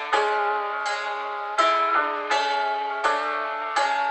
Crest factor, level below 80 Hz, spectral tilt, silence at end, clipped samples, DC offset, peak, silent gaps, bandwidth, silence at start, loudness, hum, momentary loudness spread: 16 dB; -68 dBFS; 0 dB/octave; 0 s; under 0.1%; under 0.1%; -8 dBFS; none; 9.2 kHz; 0 s; -24 LUFS; none; 6 LU